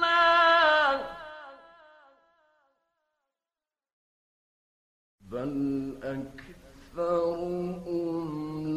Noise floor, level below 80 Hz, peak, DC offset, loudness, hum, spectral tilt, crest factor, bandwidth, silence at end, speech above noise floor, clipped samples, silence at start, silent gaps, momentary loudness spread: under -90 dBFS; -60 dBFS; -10 dBFS; under 0.1%; -26 LUFS; none; -5.5 dB/octave; 20 dB; 13.5 kHz; 0 s; over 59 dB; under 0.1%; 0 s; 3.93-5.18 s; 22 LU